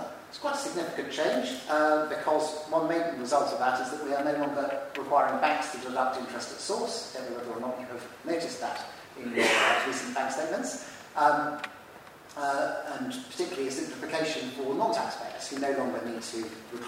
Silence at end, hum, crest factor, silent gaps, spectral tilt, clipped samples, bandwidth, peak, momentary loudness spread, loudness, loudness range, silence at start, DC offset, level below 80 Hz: 0 s; none; 20 dB; none; -3 dB/octave; under 0.1%; 16 kHz; -10 dBFS; 12 LU; -30 LUFS; 5 LU; 0 s; under 0.1%; -74 dBFS